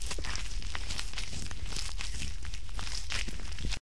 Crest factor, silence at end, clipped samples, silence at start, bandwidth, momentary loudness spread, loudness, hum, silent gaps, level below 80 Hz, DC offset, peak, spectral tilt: 24 dB; 0.2 s; under 0.1%; 0 s; 13.5 kHz; 4 LU; -38 LUFS; none; none; -40 dBFS; 3%; -14 dBFS; -2.5 dB/octave